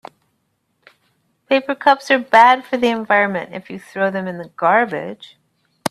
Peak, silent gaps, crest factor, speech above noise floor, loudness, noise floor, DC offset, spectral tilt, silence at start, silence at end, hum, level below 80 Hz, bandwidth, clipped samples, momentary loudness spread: 0 dBFS; none; 18 dB; 52 dB; -16 LUFS; -68 dBFS; under 0.1%; -4.5 dB/octave; 1.5 s; 0 s; none; -66 dBFS; 13.5 kHz; under 0.1%; 20 LU